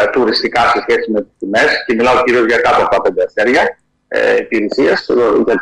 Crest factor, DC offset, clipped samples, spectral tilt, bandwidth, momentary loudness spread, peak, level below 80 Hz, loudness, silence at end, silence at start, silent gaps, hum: 10 dB; under 0.1%; under 0.1%; -4.5 dB/octave; 11 kHz; 5 LU; -2 dBFS; -44 dBFS; -12 LUFS; 0 s; 0 s; none; none